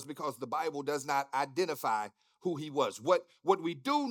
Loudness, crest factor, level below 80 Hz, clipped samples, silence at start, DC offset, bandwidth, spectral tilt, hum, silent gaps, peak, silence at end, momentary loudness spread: -33 LUFS; 20 dB; under -90 dBFS; under 0.1%; 0 s; under 0.1%; 19 kHz; -4.5 dB/octave; none; none; -14 dBFS; 0 s; 7 LU